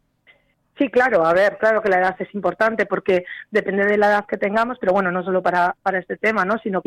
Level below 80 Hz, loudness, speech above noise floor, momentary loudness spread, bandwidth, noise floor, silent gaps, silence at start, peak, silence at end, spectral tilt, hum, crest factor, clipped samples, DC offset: -58 dBFS; -19 LUFS; 38 dB; 6 LU; 13 kHz; -57 dBFS; none; 0.8 s; -6 dBFS; 0.05 s; -6.5 dB/octave; none; 12 dB; under 0.1%; under 0.1%